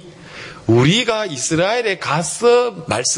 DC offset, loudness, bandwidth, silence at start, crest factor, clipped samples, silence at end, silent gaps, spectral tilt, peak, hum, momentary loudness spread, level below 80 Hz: under 0.1%; -16 LUFS; 11 kHz; 0.05 s; 14 dB; under 0.1%; 0 s; none; -4 dB/octave; -2 dBFS; none; 15 LU; -50 dBFS